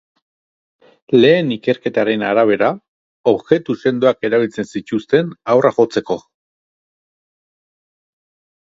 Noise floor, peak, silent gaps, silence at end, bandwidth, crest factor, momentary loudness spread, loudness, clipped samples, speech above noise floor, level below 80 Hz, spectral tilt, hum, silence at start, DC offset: under -90 dBFS; 0 dBFS; 2.88-3.24 s; 2.45 s; 7.8 kHz; 18 dB; 9 LU; -16 LUFS; under 0.1%; over 75 dB; -60 dBFS; -6.5 dB/octave; none; 1.1 s; under 0.1%